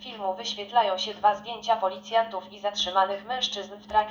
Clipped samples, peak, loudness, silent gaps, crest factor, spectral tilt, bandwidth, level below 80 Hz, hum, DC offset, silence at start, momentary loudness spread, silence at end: under 0.1%; -8 dBFS; -27 LUFS; none; 18 dB; -2 dB/octave; over 20 kHz; -62 dBFS; none; under 0.1%; 0 s; 8 LU; 0 s